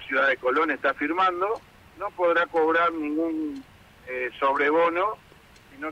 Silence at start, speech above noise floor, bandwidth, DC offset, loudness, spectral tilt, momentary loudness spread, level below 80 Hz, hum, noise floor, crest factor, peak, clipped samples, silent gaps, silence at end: 0 s; 28 dB; 10 kHz; under 0.1%; -24 LUFS; -5 dB/octave; 14 LU; -62 dBFS; none; -52 dBFS; 14 dB; -12 dBFS; under 0.1%; none; 0 s